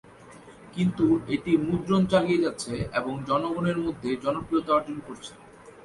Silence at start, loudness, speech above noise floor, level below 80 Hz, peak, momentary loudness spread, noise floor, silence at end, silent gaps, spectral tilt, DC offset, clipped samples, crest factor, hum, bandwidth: 0.2 s; -26 LUFS; 23 dB; -54 dBFS; -10 dBFS; 14 LU; -48 dBFS; 0 s; none; -6.5 dB/octave; under 0.1%; under 0.1%; 16 dB; none; 11.5 kHz